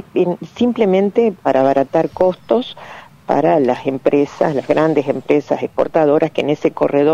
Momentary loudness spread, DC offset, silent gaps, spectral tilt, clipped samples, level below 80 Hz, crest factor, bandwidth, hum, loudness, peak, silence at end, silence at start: 5 LU; under 0.1%; none; -7.5 dB/octave; under 0.1%; -54 dBFS; 14 dB; 8.2 kHz; none; -16 LUFS; -2 dBFS; 0 s; 0.15 s